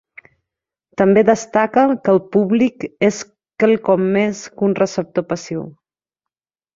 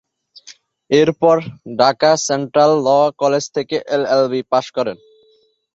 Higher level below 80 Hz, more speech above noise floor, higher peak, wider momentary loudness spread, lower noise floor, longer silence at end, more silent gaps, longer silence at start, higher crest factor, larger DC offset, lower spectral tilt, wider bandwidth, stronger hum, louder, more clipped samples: about the same, -58 dBFS vs -60 dBFS; first, 70 dB vs 41 dB; about the same, -2 dBFS vs -2 dBFS; first, 13 LU vs 9 LU; first, -86 dBFS vs -57 dBFS; first, 1.05 s vs 0.8 s; neither; first, 1 s vs 0.45 s; about the same, 16 dB vs 16 dB; neither; first, -6 dB/octave vs -4.5 dB/octave; about the same, 7.8 kHz vs 8.2 kHz; neither; about the same, -17 LUFS vs -16 LUFS; neither